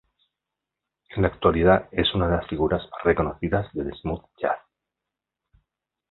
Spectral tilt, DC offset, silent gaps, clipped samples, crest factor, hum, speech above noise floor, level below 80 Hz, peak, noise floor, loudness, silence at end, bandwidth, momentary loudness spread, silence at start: -10.5 dB/octave; under 0.1%; none; under 0.1%; 22 dB; none; 63 dB; -40 dBFS; -2 dBFS; -86 dBFS; -24 LUFS; 1.55 s; 4.3 kHz; 12 LU; 1.1 s